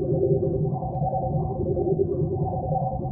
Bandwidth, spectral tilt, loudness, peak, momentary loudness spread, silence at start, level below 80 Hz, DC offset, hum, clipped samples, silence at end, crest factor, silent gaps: 1.3 kHz; -17 dB/octave; -25 LUFS; -10 dBFS; 4 LU; 0 s; -40 dBFS; under 0.1%; none; under 0.1%; 0 s; 14 dB; none